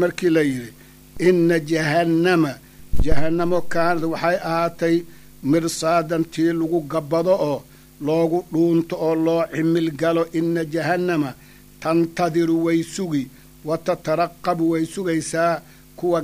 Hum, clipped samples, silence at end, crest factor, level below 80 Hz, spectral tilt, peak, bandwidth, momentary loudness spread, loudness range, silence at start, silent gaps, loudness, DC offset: none; under 0.1%; 0 s; 16 dB; -36 dBFS; -6 dB/octave; -4 dBFS; 15.5 kHz; 8 LU; 2 LU; 0 s; none; -21 LUFS; under 0.1%